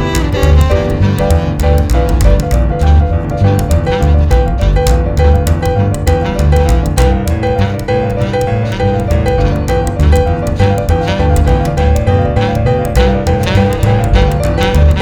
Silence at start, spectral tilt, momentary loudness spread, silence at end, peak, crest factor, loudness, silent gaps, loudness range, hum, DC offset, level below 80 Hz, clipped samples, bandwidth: 0 s; -7 dB/octave; 3 LU; 0 s; 0 dBFS; 10 dB; -12 LUFS; none; 1 LU; none; under 0.1%; -14 dBFS; 0.4%; 17.5 kHz